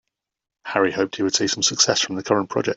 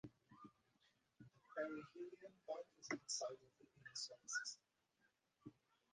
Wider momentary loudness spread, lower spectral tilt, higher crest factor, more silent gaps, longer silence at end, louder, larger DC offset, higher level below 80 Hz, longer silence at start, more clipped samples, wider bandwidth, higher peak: second, 6 LU vs 19 LU; about the same, -2.5 dB/octave vs -2 dB/octave; about the same, 20 dB vs 22 dB; neither; second, 0 s vs 0.4 s; first, -20 LUFS vs -50 LUFS; neither; first, -62 dBFS vs -90 dBFS; first, 0.65 s vs 0.05 s; neither; second, 8.4 kHz vs 10 kHz; first, -2 dBFS vs -32 dBFS